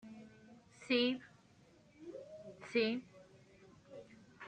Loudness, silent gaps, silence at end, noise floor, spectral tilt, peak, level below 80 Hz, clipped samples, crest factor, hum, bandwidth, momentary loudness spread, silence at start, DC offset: -37 LUFS; none; 0 s; -66 dBFS; -4.5 dB/octave; -22 dBFS; -80 dBFS; under 0.1%; 22 dB; none; 9.2 kHz; 27 LU; 0.05 s; under 0.1%